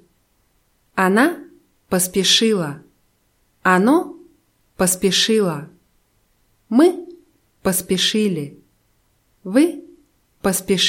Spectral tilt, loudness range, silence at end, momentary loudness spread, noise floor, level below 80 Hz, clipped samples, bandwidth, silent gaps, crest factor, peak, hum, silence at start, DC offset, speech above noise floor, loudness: -3.5 dB/octave; 3 LU; 0 s; 17 LU; -63 dBFS; -54 dBFS; under 0.1%; 16.5 kHz; none; 18 dB; -2 dBFS; none; 0.95 s; under 0.1%; 46 dB; -18 LUFS